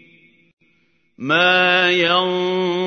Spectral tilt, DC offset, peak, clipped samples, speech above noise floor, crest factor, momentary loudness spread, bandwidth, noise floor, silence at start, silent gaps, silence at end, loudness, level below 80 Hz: -4.5 dB/octave; under 0.1%; -2 dBFS; under 0.1%; 46 dB; 18 dB; 7 LU; 6.6 kHz; -62 dBFS; 1.2 s; none; 0 s; -15 LUFS; -72 dBFS